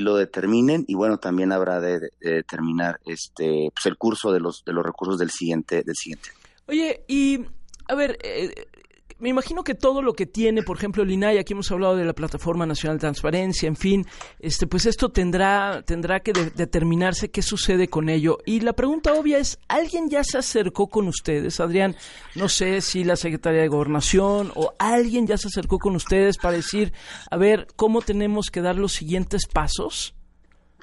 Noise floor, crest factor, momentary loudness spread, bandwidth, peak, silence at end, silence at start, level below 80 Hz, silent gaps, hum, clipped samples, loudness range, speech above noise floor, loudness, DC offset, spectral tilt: -55 dBFS; 18 dB; 7 LU; 11.5 kHz; -4 dBFS; 0.6 s; 0 s; -36 dBFS; none; none; under 0.1%; 4 LU; 33 dB; -23 LUFS; under 0.1%; -5 dB/octave